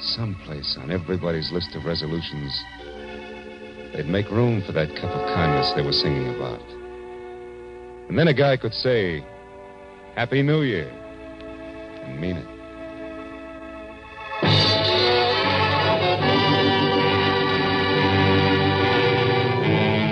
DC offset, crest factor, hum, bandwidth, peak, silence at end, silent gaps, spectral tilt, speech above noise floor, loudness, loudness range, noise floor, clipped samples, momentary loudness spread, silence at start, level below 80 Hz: under 0.1%; 16 dB; none; 9.6 kHz; -6 dBFS; 0 s; none; -6.5 dB/octave; 19 dB; -21 LUFS; 9 LU; -42 dBFS; under 0.1%; 20 LU; 0 s; -48 dBFS